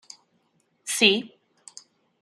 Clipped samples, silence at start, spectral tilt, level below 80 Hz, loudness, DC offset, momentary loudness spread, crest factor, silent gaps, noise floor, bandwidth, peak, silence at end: under 0.1%; 0.85 s; -2 dB/octave; -76 dBFS; -21 LUFS; under 0.1%; 27 LU; 24 dB; none; -69 dBFS; 14.5 kHz; -4 dBFS; 0.95 s